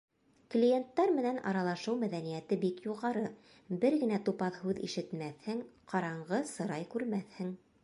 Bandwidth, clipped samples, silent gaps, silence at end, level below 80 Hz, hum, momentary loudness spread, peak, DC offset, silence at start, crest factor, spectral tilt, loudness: 11.5 kHz; under 0.1%; none; 0.25 s; -78 dBFS; none; 11 LU; -16 dBFS; under 0.1%; 0.5 s; 18 dB; -6.5 dB/octave; -35 LUFS